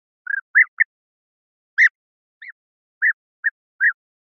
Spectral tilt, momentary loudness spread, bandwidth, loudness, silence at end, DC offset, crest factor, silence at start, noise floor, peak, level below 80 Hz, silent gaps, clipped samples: 8 dB/octave; 11 LU; 6.8 kHz; -19 LUFS; 0.4 s; under 0.1%; 18 dB; 0.3 s; under -90 dBFS; -4 dBFS; under -90 dBFS; 0.42-0.54 s, 0.68-0.77 s, 0.85-1.77 s, 1.91-2.41 s, 2.52-3.01 s, 3.14-3.43 s, 3.51-3.79 s; under 0.1%